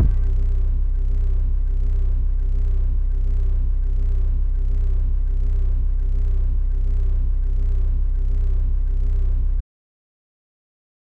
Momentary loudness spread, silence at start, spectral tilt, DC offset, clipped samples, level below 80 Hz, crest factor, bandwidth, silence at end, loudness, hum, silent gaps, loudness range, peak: 1 LU; 0 s; -10 dB/octave; under 0.1%; under 0.1%; -18 dBFS; 10 dB; 1.6 kHz; 1.45 s; -25 LUFS; none; none; 1 LU; -8 dBFS